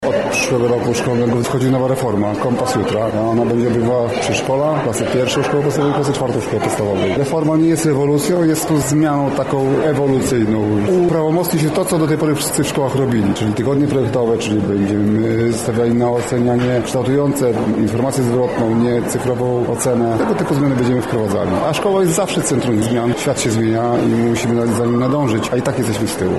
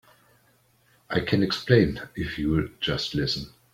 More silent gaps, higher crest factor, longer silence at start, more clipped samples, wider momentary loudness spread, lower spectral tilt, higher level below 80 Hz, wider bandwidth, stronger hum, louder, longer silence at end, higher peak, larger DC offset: neither; second, 10 dB vs 22 dB; second, 0 s vs 1.1 s; neither; second, 3 LU vs 10 LU; about the same, -6 dB/octave vs -6 dB/octave; about the same, -44 dBFS vs -46 dBFS; second, 12.5 kHz vs 16 kHz; neither; first, -16 LUFS vs -25 LUFS; second, 0 s vs 0.25 s; about the same, -6 dBFS vs -4 dBFS; first, 0.3% vs under 0.1%